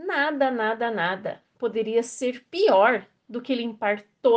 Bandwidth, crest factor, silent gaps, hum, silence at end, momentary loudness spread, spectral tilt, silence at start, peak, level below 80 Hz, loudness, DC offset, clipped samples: 9.6 kHz; 18 dB; none; none; 0 s; 12 LU; -4 dB/octave; 0 s; -6 dBFS; -76 dBFS; -24 LUFS; under 0.1%; under 0.1%